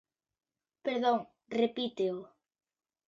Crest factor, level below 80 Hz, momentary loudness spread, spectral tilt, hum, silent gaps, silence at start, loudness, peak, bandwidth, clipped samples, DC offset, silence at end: 18 dB; -80 dBFS; 9 LU; -6 dB/octave; none; none; 0.85 s; -33 LUFS; -16 dBFS; 7.6 kHz; under 0.1%; under 0.1%; 0.8 s